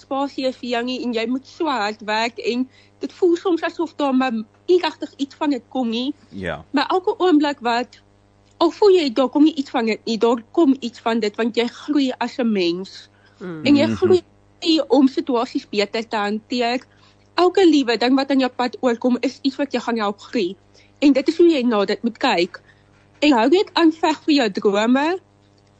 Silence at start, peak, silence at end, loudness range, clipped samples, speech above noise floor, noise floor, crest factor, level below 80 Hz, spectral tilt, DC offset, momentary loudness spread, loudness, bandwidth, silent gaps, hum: 0.1 s; -6 dBFS; 0.6 s; 4 LU; under 0.1%; 36 dB; -54 dBFS; 14 dB; -60 dBFS; -5 dB/octave; under 0.1%; 10 LU; -19 LUFS; 8.4 kHz; none; 50 Hz at -55 dBFS